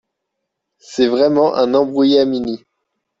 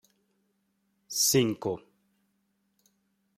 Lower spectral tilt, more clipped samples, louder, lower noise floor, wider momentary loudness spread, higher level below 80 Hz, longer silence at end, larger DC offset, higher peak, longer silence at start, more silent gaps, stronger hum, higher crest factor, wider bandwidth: first, -5.5 dB/octave vs -3 dB/octave; neither; first, -15 LUFS vs -27 LUFS; about the same, -76 dBFS vs -75 dBFS; about the same, 12 LU vs 13 LU; first, -58 dBFS vs -70 dBFS; second, 0.65 s vs 1.6 s; neither; first, -2 dBFS vs -12 dBFS; second, 0.9 s vs 1.1 s; neither; neither; second, 14 dB vs 22 dB; second, 7.8 kHz vs 16.5 kHz